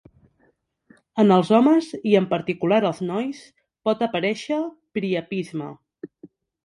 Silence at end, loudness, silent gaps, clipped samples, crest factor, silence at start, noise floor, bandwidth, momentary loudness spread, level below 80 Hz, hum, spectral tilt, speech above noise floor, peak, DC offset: 0.4 s; -22 LUFS; none; under 0.1%; 20 dB; 1.15 s; -65 dBFS; 11 kHz; 21 LU; -68 dBFS; none; -7 dB/octave; 44 dB; -4 dBFS; under 0.1%